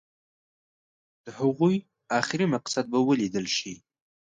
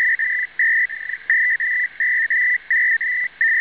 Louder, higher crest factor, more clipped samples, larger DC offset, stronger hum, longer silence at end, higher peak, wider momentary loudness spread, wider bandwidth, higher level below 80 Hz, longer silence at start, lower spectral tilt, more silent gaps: second, -26 LUFS vs -17 LUFS; first, 22 dB vs 14 dB; neither; second, under 0.1% vs 0.1%; neither; first, 0.6 s vs 0 s; about the same, -8 dBFS vs -6 dBFS; first, 10 LU vs 4 LU; first, 9.4 kHz vs 4 kHz; about the same, -70 dBFS vs -66 dBFS; first, 1.25 s vs 0 s; first, -5 dB/octave vs -1.5 dB/octave; neither